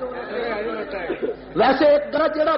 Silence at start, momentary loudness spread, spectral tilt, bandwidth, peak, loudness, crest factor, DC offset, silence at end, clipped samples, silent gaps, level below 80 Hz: 0 s; 11 LU; -2.5 dB/octave; 5.8 kHz; -8 dBFS; -21 LUFS; 14 dB; under 0.1%; 0 s; under 0.1%; none; -50 dBFS